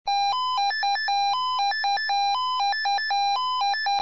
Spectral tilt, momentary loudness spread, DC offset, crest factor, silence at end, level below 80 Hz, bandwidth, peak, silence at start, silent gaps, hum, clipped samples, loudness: 2 dB/octave; 1 LU; 0.5%; 8 dB; 0 s; -66 dBFS; 7.6 kHz; -16 dBFS; 0.05 s; none; none; under 0.1%; -23 LUFS